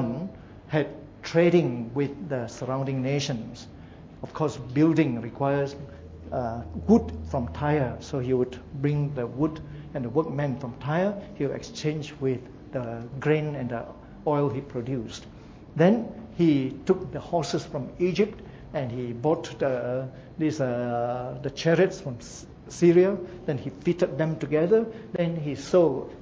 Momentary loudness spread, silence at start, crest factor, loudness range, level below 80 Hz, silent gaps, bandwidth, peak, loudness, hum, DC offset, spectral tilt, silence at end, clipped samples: 15 LU; 0 s; 20 dB; 4 LU; -50 dBFS; none; 8 kHz; -8 dBFS; -27 LUFS; none; under 0.1%; -7 dB/octave; 0 s; under 0.1%